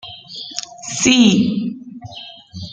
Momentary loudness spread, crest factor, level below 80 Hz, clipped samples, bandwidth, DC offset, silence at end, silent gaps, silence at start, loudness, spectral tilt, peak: 22 LU; 18 dB; -54 dBFS; under 0.1%; 9.4 kHz; under 0.1%; 0 s; none; 0.05 s; -16 LUFS; -3.5 dB/octave; 0 dBFS